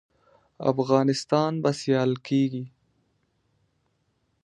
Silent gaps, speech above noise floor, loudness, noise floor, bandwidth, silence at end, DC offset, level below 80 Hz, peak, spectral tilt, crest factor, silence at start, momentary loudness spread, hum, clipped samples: none; 48 dB; -25 LUFS; -72 dBFS; 11 kHz; 1.8 s; under 0.1%; -70 dBFS; -6 dBFS; -6.5 dB/octave; 22 dB; 0.6 s; 7 LU; none; under 0.1%